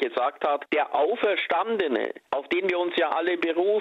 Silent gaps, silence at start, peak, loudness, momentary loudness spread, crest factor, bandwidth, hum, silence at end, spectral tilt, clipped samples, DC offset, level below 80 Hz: none; 0 s; -10 dBFS; -25 LUFS; 4 LU; 14 dB; 6.6 kHz; none; 0 s; -5.5 dB/octave; under 0.1%; under 0.1%; -72 dBFS